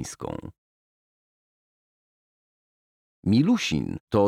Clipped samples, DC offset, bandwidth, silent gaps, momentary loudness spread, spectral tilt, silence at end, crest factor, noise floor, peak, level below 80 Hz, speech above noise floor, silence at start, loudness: under 0.1%; under 0.1%; 14 kHz; 0.58-3.23 s, 4.00-4.07 s; 15 LU; -6 dB/octave; 0 s; 18 dB; under -90 dBFS; -10 dBFS; -54 dBFS; over 66 dB; 0 s; -25 LUFS